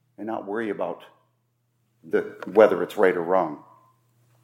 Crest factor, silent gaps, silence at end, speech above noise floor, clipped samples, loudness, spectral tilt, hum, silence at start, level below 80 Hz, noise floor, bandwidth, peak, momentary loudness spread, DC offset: 22 dB; none; 0.85 s; 48 dB; under 0.1%; -24 LUFS; -6.5 dB/octave; none; 0.2 s; -78 dBFS; -71 dBFS; 16 kHz; -2 dBFS; 15 LU; under 0.1%